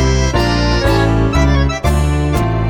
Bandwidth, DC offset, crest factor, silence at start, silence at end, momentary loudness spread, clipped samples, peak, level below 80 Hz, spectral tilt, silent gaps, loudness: 17.5 kHz; under 0.1%; 12 dB; 0 s; 0 s; 2 LU; under 0.1%; 0 dBFS; -18 dBFS; -6 dB/octave; none; -14 LUFS